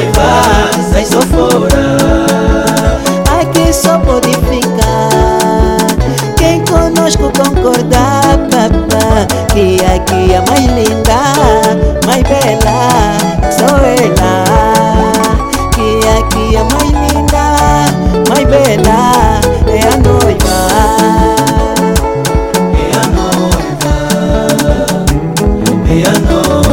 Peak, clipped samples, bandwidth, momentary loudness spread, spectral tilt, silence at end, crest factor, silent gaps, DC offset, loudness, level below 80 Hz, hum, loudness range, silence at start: 0 dBFS; 2%; 18 kHz; 4 LU; -5 dB/octave; 0 s; 8 dB; none; under 0.1%; -9 LUFS; -16 dBFS; none; 2 LU; 0 s